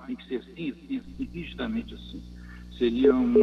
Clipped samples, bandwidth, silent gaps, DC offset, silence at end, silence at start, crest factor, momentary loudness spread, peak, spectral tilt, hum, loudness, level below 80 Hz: under 0.1%; 6.4 kHz; none; under 0.1%; 0 s; 0 s; 18 dB; 21 LU; -8 dBFS; -8 dB/octave; 60 Hz at -45 dBFS; -28 LUFS; -46 dBFS